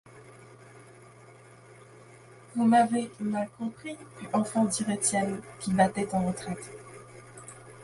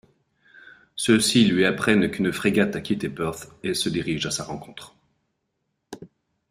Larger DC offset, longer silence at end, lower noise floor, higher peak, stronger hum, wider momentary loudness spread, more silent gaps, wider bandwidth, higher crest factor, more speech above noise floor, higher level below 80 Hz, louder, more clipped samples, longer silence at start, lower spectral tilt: neither; second, 0 s vs 0.45 s; second, -52 dBFS vs -76 dBFS; second, -8 dBFS vs -4 dBFS; neither; about the same, 23 LU vs 24 LU; neither; second, 11.5 kHz vs 15.5 kHz; about the same, 22 dB vs 22 dB; second, 25 dB vs 54 dB; second, -64 dBFS vs -56 dBFS; second, -28 LUFS vs -22 LUFS; neither; second, 0.05 s vs 0.95 s; about the same, -5 dB/octave vs -4 dB/octave